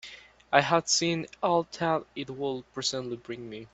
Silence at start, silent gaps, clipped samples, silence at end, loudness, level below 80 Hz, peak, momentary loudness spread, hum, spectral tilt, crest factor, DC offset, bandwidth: 0.05 s; none; under 0.1%; 0.1 s; -28 LUFS; -64 dBFS; -4 dBFS; 15 LU; none; -3 dB/octave; 26 dB; under 0.1%; 8.4 kHz